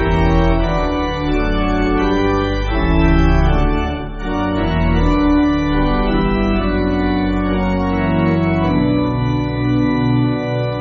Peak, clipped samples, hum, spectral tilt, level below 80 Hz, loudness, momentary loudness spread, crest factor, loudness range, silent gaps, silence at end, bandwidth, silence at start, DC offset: -2 dBFS; under 0.1%; none; -6 dB/octave; -20 dBFS; -17 LUFS; 4 LU; 14 dB; 1 LU; none; 0 s; 7 kHz; 0 s; under 0.1%